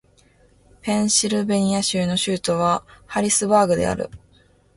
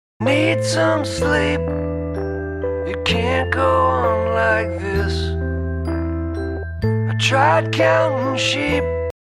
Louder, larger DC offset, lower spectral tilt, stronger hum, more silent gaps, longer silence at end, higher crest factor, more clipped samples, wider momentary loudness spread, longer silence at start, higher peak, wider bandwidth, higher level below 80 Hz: about the same, -20 LUFS vs -19 LUFS; neither; second, -4 dB/octave vs -5.5 dB/octave; neither; neither; first, 0.6 s vs 0.15 s; about the same, 18 dB vs 14 dB; neither; about the same, 10 LU vs 9 LU; first, 0.85 s vs 0.2 s; about the same, -4 dBFS vs -4 dBFS; about the same, 11.5 kHz vs 12.5 kHz; second, -50 dBFS vs -32 dBFS